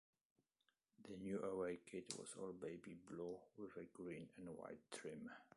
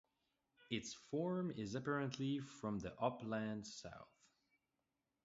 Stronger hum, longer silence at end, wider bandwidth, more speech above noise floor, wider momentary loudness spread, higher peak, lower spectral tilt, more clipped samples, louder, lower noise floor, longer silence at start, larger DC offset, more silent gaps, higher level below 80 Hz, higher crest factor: neither; second, 0.1 s vs 1.2 s; first, 11.5 kHz vs 7.6 kHz; second, 36 dB vs 46 dB; about the same, 10 LU vs 9 LU; second, -30 dBFS vs -24 dBFS; about the same, -5 dB/octave vs -5.5 dB/octave; neither; second, -52 LUFS vs -44 LUFS; about the same, -88 dBFS vs -89 dBFS; first, 1 s vs 0.6 s; neither; neither; second, -82 dBFS vs -74 dBFS; about the same, 22 dB vs 22 dB